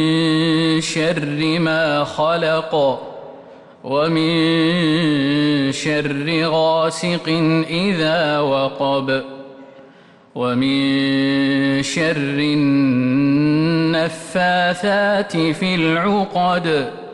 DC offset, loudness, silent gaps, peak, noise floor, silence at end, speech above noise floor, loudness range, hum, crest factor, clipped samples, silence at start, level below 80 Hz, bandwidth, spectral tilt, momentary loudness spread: under 0.1%; -17 LUFS; none; -8 dBFS; -46 dBFS; 0 s; 29 dB; 3 LU; none; 10 dB; under 0.1%; 0 s; -56 dBFS; 11.5 kHz; -5.5 dB/octave; 4 LU